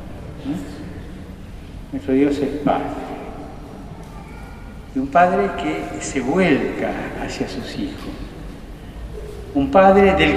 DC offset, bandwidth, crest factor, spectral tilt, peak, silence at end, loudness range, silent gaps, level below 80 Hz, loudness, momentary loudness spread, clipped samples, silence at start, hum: under 0.1%; 14 kHz; 20 dB; -6 dB/octave; -2 dBFS; 0 s; 4 LU; none; -36 dBFS; -19 LUFS; 21 LU; under 0.1%; 0 s; none